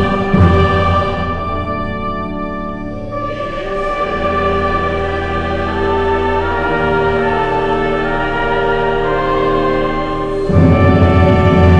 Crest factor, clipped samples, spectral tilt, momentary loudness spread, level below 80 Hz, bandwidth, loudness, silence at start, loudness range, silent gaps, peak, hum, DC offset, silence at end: 14 dB; under 0.1%; -8 dB/octave; 11 LU; -24 dBFS; 7.6 kHz; -15 LUFS; 0 s; 6 LU; none; 0 dBFS; none; under 0.1%; 0 s